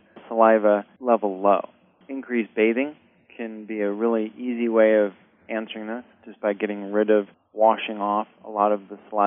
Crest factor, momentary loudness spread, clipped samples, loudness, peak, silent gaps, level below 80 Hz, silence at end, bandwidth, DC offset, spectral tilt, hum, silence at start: 20 dB; 16 LU; under 0.1%; -23 LUFS; -2 dBFS; none; -82 dBFS; 0 s; 3.7 kHz; under 0.1%; -4 dB/octave; none; 0.15 s